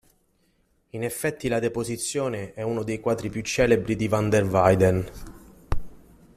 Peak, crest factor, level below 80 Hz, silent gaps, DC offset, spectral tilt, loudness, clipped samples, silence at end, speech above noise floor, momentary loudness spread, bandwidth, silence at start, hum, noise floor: -4 dBFS; 22 dB; -42 dBFS; none; under 0.1%; -5.5 dB/octave; -25 LUFS; under 0.1%; 0.4 s; 43 dB; 16 LU; 14.5 kHz; 0.95 s; none; -66 dBFS